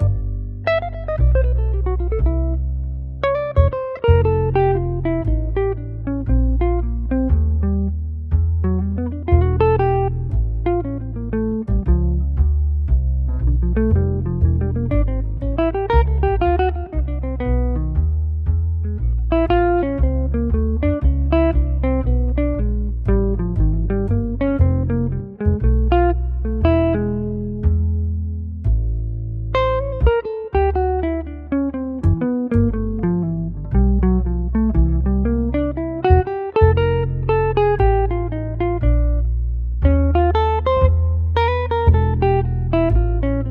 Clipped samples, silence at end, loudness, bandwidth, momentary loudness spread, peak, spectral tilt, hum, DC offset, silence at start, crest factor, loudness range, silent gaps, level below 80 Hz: under 0.1%; 0 s; -19 LUFS; 4.4 kHz; 7 LU; 0 dBFS; -11 dB/octave; none; under 0.1%; 0 s; 18 dB; 3 LU; none; -20 dBFS